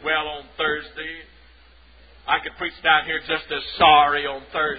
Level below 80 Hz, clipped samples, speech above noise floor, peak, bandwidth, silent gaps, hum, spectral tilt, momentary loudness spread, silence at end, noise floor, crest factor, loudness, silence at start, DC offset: -50 dBFS; under 0.1%; 30 dB; -2 dBFS; 5 kHz; none; none; -7.5 dB/octave; 18 LU; 0 s; -51 dBFS; 20 dB; -20 LUFS; 0 s; 0.1%